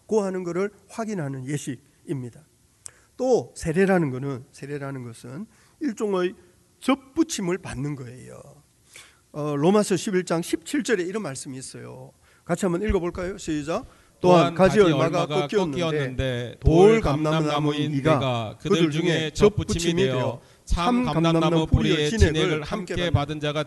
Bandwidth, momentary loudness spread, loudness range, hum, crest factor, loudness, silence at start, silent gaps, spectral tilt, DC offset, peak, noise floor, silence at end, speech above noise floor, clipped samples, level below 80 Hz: 12 kHz; 17 LU; 8 LU; none; 20 dB; -23 LUFS; 0.1 s; none; -6 dB/octave; under 0.1%; -4 dBFS; -50 dBFS; 0 s; 27 dB; under 0.1%; -38 dBFS